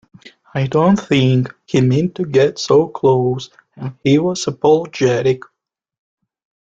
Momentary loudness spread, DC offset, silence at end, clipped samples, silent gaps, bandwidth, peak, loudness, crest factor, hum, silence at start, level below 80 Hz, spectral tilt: 10 LU; under 0.1%; 1.2 s; under 0.1%; none; 8 kHz; -2 dBFS; -16 LUFS; 14 dB; none; 0.25 s; -52 dBFS; -6.5 dB/octave